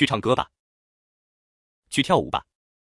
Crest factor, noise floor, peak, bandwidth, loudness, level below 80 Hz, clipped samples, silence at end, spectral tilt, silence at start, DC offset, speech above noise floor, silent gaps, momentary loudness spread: 22 dB; under -90 dBFS; -4 dBFS; 12 kHz; -23 LUFS; -56 dBFS; under 0.1%; 0.4 s; -5 dB/octave; 0 s; under 0.1%; over 68 dB; 0.59-1.82 s; 9 LU